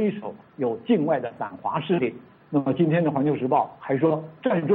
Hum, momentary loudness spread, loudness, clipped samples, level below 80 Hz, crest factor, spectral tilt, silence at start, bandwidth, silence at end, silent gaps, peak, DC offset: none; 8 LU; -24 LUFS; under 0.1%; -68 dBFS; 14 dB; -11.5 dB/octave; 0 s; 4.1 kHz; 0 s; none; -10 dBFS; under 0.1%